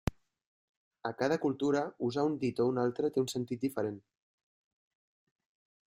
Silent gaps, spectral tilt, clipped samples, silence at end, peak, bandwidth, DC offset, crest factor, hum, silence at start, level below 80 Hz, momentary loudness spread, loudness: 0.46-0.91 s; -6 dB/octave; under 0.1%; 1.85 s; -14 dBFS; 15.5 kHz; under 0.1%; 20 dB; none; 0.05 s; -56 dBFS; 9 LU; -33 LUFS